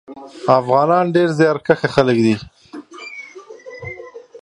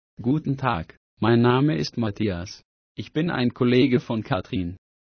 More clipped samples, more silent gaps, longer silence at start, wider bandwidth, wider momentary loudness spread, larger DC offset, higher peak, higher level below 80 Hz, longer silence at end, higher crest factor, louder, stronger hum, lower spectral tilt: neither; second, none vs 0.97-1.17 s, 2.65-2.95 s; about the same, 0.1 s vs 0.2 s; first, 11 kHz vs 6.6 kHz; first, 22 LU vs 17 LU; neither; first, 0 dBFS vs -6 dBFS; second, -54 dBFS vs -48 dBFS; second, 0.05 s vs 0.3 s; about the same, 18 dB vs 18 dB; first, -16 LUFS vs -23 LUFS; neither; about the same, -7 dB/octave vs -7.5 dB/octave